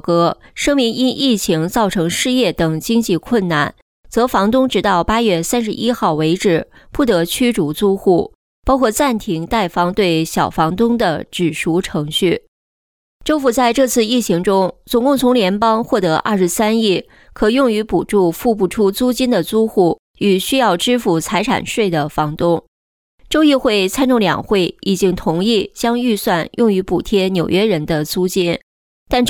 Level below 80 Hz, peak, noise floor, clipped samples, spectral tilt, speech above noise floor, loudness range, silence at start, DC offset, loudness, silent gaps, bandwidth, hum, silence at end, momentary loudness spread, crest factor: -40 dBFS; -2 dBFS; under -90 dBFS; under 0.1%; -5 dB/octave; over 75 dB; 2 LU; 0.05 s; under 0.1%; -16 LUFS; 3.82-4.03 s, 8.35-8.63 s, 12.48-13.20 s, 19.99-20.14 s, 22.68-23.18 s, 28.63-29.06 s; 19.5 kHz; none; 0 s; 5 LU; 12 dB